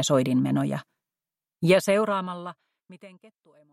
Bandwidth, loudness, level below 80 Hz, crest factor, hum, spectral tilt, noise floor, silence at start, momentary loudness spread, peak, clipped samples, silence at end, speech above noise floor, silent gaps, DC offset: 15.5 kHz; -24 LUFS; -70 dBFS; 20 dB; none; -5.5 dB/octave; under -90 dBFS; 0 s; 15 LU; -6 dBFS; under 0.1%; 0.65 s; over 65 dB; none; under 0.1%